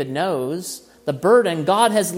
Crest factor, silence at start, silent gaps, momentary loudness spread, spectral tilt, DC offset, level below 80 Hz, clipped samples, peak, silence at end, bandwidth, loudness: 18 dB; 0 s; none; 13 LU; -4.5 dB/octave; under 0.1%; -66 dBFS; under 0.1%; -2 dBFS; 0 s; 16.5 kHz; -19 LUFS